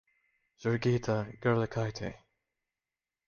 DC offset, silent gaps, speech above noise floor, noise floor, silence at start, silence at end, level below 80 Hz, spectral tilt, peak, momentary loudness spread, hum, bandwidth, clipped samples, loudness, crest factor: under 0.1%; none; over 59 dB; under -90 dBFS; 0.6 s; 1.1 s; -60 dBFS; -7 dB/octave; -16 dBFS; 9 LU; none; 7 kHz; under 0.1%; -32 LUFS; 18 dB